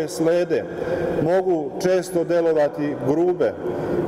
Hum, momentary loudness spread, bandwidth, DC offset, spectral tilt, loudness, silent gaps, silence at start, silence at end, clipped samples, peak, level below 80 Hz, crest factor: none; 5 LU; 15.5 kHz; under 0.1%; -6.5 dB/octave; -21 LUFS; none; 0 s; 0 s; under 0.1%; -6 dBFS; -52 dBFS; 14 dB